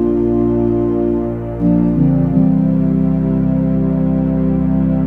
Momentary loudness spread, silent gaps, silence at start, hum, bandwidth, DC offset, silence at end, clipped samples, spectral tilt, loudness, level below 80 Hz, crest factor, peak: 3 LU; none; 0 s; none; 3.3 kHz; 0.6%; 0 s; under 0.1%; -12.5 dB/octave; -15 LUFS; -30 dBFS; 12 dB; 0 dBFS